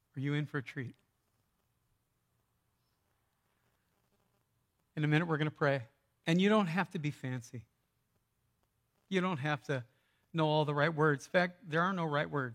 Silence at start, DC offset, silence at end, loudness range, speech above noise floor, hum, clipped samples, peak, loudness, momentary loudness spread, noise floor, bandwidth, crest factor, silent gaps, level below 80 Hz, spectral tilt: 0.15 s; under 0.1%; 0 s; 10 LU; 46 dB; none; under 0.1%; -14 dBFS; -33 LUFS; 12 LU; -79 dBFS; 11 kHz; 22 dB; none; -80 dBFS; -6.5 dB/octave